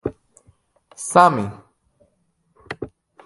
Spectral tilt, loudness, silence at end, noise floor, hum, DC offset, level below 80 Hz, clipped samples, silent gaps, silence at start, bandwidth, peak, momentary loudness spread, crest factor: -5 dB/octave; -18 LUFS; 0.4 s; -67 dBFS; none; under 0.1%; -54 dBFS; under 0.1%; none; 0.05 s; 11.5 kHz; 0 dBFS; 21 LU; 22 dB